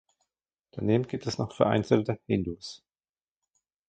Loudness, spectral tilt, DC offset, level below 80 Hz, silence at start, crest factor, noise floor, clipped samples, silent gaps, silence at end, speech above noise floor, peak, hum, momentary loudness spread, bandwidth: -28 LUFS; -7 dB/octave; under 0.1%; -56 dBFS; 0.75 s; 24 dB; under -90 dBFS; under 0.1%; none; 1.1 s; over 63 dB; -6 dBFS; none; 15 LU; 9 kHz